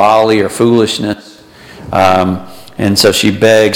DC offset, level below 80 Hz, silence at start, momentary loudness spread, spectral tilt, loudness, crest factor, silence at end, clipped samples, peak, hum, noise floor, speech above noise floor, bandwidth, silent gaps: under 0.1%; -44 dBFS; 0 s; 12 LU; -4.5 dB/octave; -10 LUFS; 10 dB; 0 s; under 0.1%; 0 dBFS; none; -34 dBFS; 24 dB; 17 kHz; none